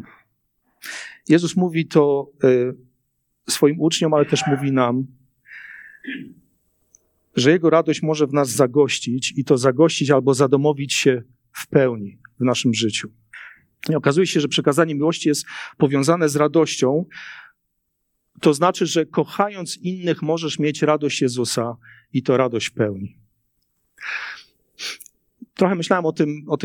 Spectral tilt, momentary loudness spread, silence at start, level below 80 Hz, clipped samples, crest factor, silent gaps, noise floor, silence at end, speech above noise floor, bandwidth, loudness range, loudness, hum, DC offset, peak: -5 dB/octave; 17 LU; 0.85 s; -68 dBFS; under 0.1%; 20 dB; none; -73 dBFS; 0 s; 54 dB; 18.5 kHz; 6 LU; -19 LUFS; none; under 0.1%; -2 dBFS